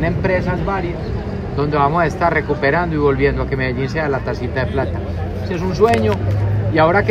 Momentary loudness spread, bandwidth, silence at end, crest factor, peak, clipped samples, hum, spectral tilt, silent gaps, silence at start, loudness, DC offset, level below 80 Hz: 9 LU; 11 kHz; 0 s; 16 dB; 0 dBFS; under 0.1%; none; -7.5 dB/octave; none; 0 s; -18 LUFS; under 0.1%; -30 dBFS